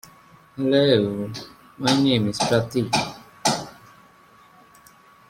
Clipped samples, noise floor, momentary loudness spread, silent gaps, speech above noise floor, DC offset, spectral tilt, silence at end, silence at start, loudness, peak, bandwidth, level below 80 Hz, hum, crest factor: under 0.1%; -52 dBFS; 17 LU; none; 32 dB; under 0.1%; -4.5 dB/octave; 1.55 s; 0.55 s; -22 LUFS; -4 dBFS; 16.5 kHz; -56 dBFS; none; 20 dB